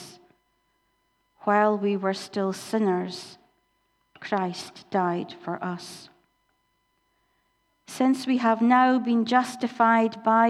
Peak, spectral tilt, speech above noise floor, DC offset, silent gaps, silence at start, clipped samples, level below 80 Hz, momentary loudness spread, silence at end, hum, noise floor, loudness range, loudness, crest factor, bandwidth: -6 dBFS; -5.5 dB/octave; 48 dB; under 0.1%; none; 0 s; under 0.1%; -78 dBFS; 17 LU; 0 s; none; -72 dBFS; 9 LU; -24 LUFS; 20 dB; 13 kHz